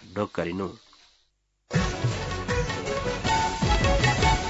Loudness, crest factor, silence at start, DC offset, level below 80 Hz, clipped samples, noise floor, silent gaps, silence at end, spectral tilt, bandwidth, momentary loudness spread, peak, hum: -26 LUFS; 16 dB; 0 s; under 0.1%; -34 dBFS; under 0.1%; -70 dBFS; none; 0 s; -4.5 dB/octave; 8 kHz; 9 LU; -10 dBFS; 50 Hz at -50 dBFS